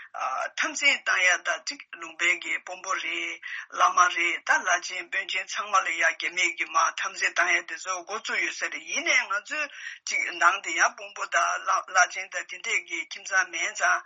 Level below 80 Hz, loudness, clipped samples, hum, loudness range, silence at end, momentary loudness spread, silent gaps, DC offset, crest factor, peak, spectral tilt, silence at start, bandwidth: under -90 dBFS; -25 LUFS; under 0.1%; none; 2 LU; 0 s; 10 LU; none; under 0.1%; 20 dB; -6 dBFS; 4 dB/octave; 0 s; 8 kHz